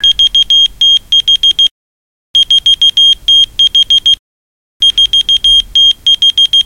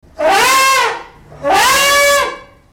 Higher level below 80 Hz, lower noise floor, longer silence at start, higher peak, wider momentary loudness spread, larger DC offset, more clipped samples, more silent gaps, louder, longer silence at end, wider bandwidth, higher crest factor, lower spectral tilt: first, -36 dBFS vs -44 dBFS; first, under -90 dBFS vs -31 dBFS; second, 0 s vs 0.2 s; about the same, 0 dBFS vs 0 dBFS; second, 5 LU vs 12 LU; first, 0.1% vs under 0.1%; neither; first, 1.71-2.34 s, 4.19-4.80 s vs none; first, -5 LUFS vs -11 LUFS; second, 0.05 s vs 0.3 s; second, 17 kHz vs over 20 kHz; about the same, 8 dB vs 12 dB; second, 2 dB/octave vs 0 dB/octave